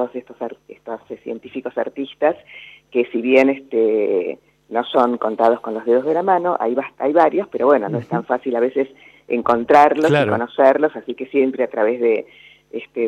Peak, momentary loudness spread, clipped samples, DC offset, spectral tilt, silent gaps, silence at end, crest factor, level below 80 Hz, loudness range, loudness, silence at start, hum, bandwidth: -2 dBFS; 16 LU; under 0.1%; under 0.1%; -7 dB/octave; none; 0 s; 16 dB; -66 dBFS; 3 LU; -18 LUFS; 0 s; none; 9.2 kHz